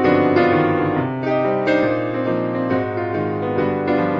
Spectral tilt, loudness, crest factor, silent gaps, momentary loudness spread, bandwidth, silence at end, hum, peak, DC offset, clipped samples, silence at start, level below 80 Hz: -9 dB/octave; -19 LUFS; 14 dB; none; 6 LU; 7 kHz; 0 s; none; -4 dBFS; under 0.1%; under 0.1%; 0 s; -54 dBFS